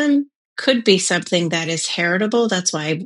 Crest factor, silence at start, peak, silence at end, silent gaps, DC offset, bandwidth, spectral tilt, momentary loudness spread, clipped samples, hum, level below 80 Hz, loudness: 18 dB; 0 s; 0 dBFS; 0 s; 0.35-0.56 s; under 0.1%; 11.5 kHz; -3.5 dB/octave; 6 LU; under 0.1%; none; -76 dBFS; -18 LUFS